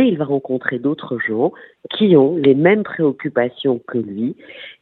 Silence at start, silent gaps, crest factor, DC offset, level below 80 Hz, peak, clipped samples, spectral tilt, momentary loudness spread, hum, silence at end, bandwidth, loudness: 0 s; none; 16 dB; under 0.1%; -64 dBFS; 0 dBFS; under 0.1%; -10 dB/octave; 12 LU; none; 0.1 s; 4.3 kHz; -17 LUFS